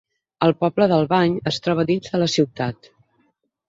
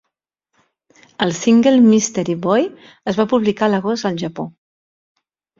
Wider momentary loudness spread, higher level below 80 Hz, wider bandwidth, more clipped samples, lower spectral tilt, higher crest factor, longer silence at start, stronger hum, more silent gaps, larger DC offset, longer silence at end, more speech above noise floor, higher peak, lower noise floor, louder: second, 6 LU vs 14 LU; about the same, -58 dBFS vs -58 dBFS; about the same, 7.8 kHz vs 7.6 kHz; neither; about the same, -6 dB/octave vs -5 dB/octave; about the same, 18 dB vs 18 dB; second, 0.4 s vs 1.2 s; neither; neither; neither; second, 0.95 s vs 1.1 s; second, 47 dB vs 62 dB; about the same, -2 dBFS vs 0 dBFS; second, -66 dBFS vs -78 dBFS; second, -20 LUFS vs -16 LUFS